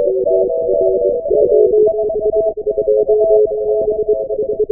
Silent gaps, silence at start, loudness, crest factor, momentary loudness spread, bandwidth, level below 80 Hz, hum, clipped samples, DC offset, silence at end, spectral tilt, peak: none; 0 s; -14 LUFS; 12 dB; 6 LU; 0.9 kHz; -44 dBFS; none; under 0.1%; 0.2%; 0 s; -17 dB/octave; 0 dBFS